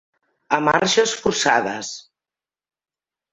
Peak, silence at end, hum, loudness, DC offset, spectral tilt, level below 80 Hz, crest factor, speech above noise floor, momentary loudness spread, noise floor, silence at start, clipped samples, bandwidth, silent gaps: -2 dBFS; 1.3 s; none; -19 LUFS; under 0.1%; -2.5 dB/octave; -58 dBFS; 22 dB; over 71 dB; 14 LU; under -90 dBFS; 0.5 s; under 0.1%; 8.4 kHz; none